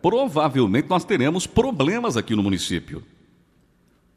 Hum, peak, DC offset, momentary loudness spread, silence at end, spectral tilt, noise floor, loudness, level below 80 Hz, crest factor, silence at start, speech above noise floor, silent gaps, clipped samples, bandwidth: none; -6 dBFS; under 0.1%; 7 LU; 1.15 s; -5.5 dB/octave; -60 dBFS; -21 LUFS; -46 dBFS; 18 dB; 0.05 s; 39 dB; none; under 0.1%; 14.5 kHz